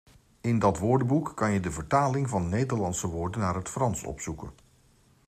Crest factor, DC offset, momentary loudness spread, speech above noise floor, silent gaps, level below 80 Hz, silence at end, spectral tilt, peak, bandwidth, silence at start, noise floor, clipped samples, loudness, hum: 18 dB; under 0.1%; 11 LU; 34 dB; none; -52 dBFS; 0.75 s; -6.5 dB/octave; -10 dBFS; 15 kHz; 0.45 s; -62 dBFS; under 0.1%; -28 LUFS; none